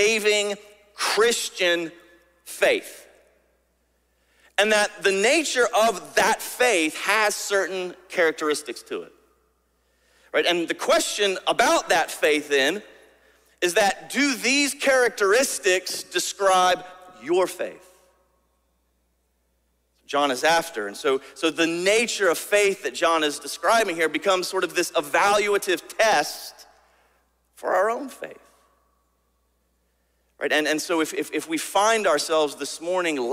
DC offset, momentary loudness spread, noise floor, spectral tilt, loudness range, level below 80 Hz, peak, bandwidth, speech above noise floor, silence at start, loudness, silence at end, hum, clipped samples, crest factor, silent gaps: under 0.1%; 10 LU; -69 dBFS; -1.5 dB/octave; 7 LU; -66 dBFS; -6 dBFS; 16 kHz; 47 dB; 0 s; -22 LUFS; 0 s; none; under 0.1%; 18 dB; none